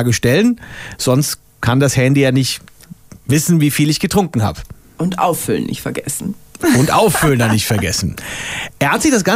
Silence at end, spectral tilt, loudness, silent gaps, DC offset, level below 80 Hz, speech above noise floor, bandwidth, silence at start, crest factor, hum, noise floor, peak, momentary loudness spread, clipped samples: 0 s; -5 dB/octave; -15 LUFS; none; under 0.1%; -40 dBFS; 24 dB; 16 kHz; 0 s; 14 dB; none; -38 dBFS; -2 dBFS; 10 LU; under 0.1%